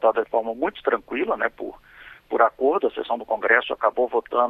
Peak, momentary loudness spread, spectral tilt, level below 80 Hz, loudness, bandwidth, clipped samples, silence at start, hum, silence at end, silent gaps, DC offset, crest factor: -2 dBFS; 8 LU; -6 dB/octave; -58 dBFS; -23 LUFS; 4.5 kHz; under 0.1%; 0 s; none; 0 s; none; under 0.1%; 20 dB